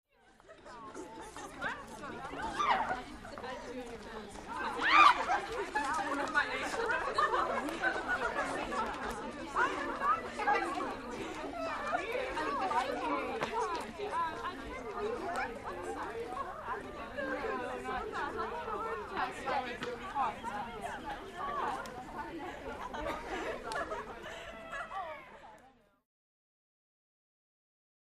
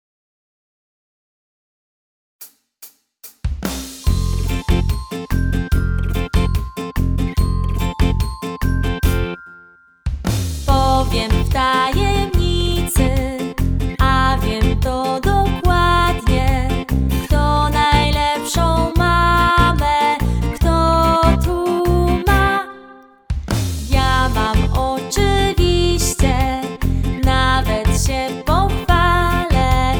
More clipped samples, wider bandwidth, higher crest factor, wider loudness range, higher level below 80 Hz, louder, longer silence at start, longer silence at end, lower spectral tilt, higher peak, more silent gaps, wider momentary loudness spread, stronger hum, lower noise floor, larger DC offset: neither; second, 13 kHz vs over 20 kHz; first, 28 dB vs 16 dB; first, 11 LU vs 6 LU; second, -58 dBFS vs -22 dBFS; second, -35 LUFS vs -17 LUFS; second, 0.45 s vs 2.4 s; first, 2.3 s vs 0 s; second, -3.5 dB/octave vs -5.5 dB/octave; second, -8 dBFS vs 0 dBFS; neither; first, 13 LU vs 8 LU; neither; first, -63 dBFS vs -47 dBFS; neither